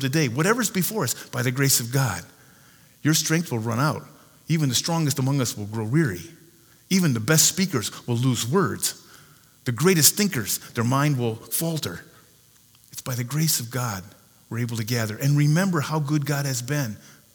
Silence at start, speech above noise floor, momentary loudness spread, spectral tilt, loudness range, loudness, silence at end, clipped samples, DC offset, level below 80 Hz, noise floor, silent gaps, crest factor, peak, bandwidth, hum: 0 s; 33 dB; 12 LU; -4 dB/octave; 5 LU; -23 LUFS; 0.4 s; under 0.1%; under 0.1%; -64 dBFS; -56 dBFS; none; 24 dB; 0 dBFS; over 20 kHz; none